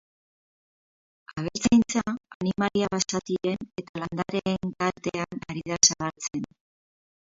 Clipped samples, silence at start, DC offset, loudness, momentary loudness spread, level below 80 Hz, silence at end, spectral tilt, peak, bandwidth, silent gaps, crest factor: under 0.1%; 1.3 s; under 0.1%; -26 LUFS; 15 LU; -56 dBFS; 0.95 s; -3.5 dB/octave; -4 dBFS; 7.8 kHz; 2.35-2.40 s, 3.89-3.94 s; 24 dB